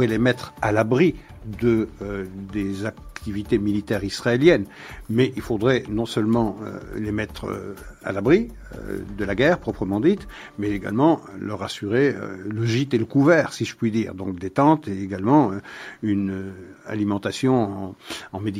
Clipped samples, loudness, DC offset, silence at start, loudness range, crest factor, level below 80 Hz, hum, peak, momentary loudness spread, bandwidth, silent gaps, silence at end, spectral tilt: under 0.1%; -23 LUFS; under 0.1%; 0 s; 3 LU; 20 dB; -46 dBFS; none; -2 dBFS; 14 LU; 15 kHz; none; 0 s; -6.5 dB/octave